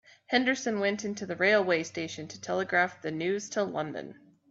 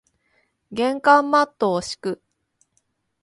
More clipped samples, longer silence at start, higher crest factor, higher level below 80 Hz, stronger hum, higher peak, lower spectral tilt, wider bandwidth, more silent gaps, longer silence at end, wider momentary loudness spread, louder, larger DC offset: neither; second, 0.3 s vs 0.7 s; about the same, 20 dB vs 22 dB; second, -74 dBFS vs -64 dBFS; neither; second, -10 dBFS vs -2 dBFS; about the same, -4 dB/octave vs -4.5 dB/octave; second, 8 kHz vs 11.5 kHz; neither; second, 0.4 s vs 1.1 s; second, 12 LU vs 16 LU; second, -29 LUFS vs -20 LUFS; neither